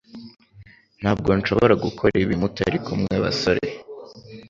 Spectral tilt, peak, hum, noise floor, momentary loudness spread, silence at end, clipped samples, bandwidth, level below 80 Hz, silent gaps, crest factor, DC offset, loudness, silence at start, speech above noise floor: -6.5 dB/octave; -2 dBFS; none; -49 dBFS; 22 LU; 0.05 s; under 0.1%; 7.6 kHz; -44 dBFS; none; 20 dB; under 0.1%; -21 LUFS; 0.15 s; 29 dB